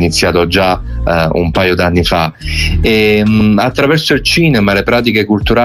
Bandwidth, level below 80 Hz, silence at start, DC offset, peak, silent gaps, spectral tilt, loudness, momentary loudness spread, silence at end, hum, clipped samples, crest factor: 19 kHz; -22 dBFS; 0 s; under 0.1%; 0 dBFS; none; -5.5 dB/octave; -11 LUFS; 5 LU; 0 s; none; under 0.1%; 10 dB